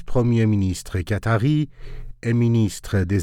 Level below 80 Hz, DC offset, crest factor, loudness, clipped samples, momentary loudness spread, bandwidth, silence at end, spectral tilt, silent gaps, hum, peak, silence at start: -38 dBFS; under 0.1%; 12 dB; -21 LUFS; under 0.1%; 11 LU; 14 kHz; 0 s; -7 dB/octave; none; none; -8 dBFS; 0 s